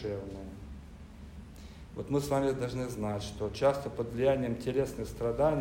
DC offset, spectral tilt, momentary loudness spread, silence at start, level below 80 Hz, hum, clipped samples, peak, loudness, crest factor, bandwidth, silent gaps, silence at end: under 0.1%; -6.5 dB/octave; 20 LU; 0 s; -50 dBFS; none; under 0.1%; -16 dBFS; -32 LUFS; 18 dB; 16 kHz; none; 0 s